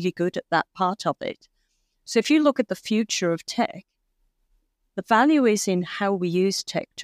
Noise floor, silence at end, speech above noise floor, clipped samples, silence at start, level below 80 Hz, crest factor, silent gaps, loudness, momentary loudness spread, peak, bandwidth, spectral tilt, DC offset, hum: -71 dBFS; 0 s; 48 dB; under 0.1%; 0 s; -70 dBFS; 18 dB; none; -23 LUFS; 11 LU; -6 dBFS; 15.5 kHz; -4.5 dB/octave; under 0.1%; none